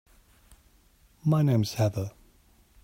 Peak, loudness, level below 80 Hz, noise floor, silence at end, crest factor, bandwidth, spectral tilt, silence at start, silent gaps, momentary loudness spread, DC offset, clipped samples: -12 dBFS; -27 LUFS; -60 dBFS; -61 dBFS; 0.75 s; 16 dB; 16 kHz; -7 dB/octave; 1.25 s; none; 12 LU; under 0.1%; under 0.1%